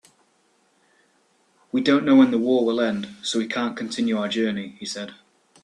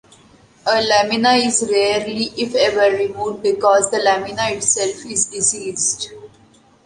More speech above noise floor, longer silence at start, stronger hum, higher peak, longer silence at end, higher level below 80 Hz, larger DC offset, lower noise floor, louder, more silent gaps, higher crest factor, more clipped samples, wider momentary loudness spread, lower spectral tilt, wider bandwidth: first, 43 dB vs 34 dB; first, 1.75 s vs 0.65 s; neither; about the same, -4 dBFS vs -2 dBFS; about the same, 0.5 s vs 0.6 s; second, -68 dBFS vs -56 dBFS; neither; first, -64 dBFS vs -51 dBFS; second, -22 LUFS vs -17 LUFS; neither; about the same, 18 dB vs 16 dB; neither; first, 15 LU vs 7 LU; first, -4.5 dB/octave vs -1.5 dB/octave; about the same, 10.5 kHz vs 11.5 kHz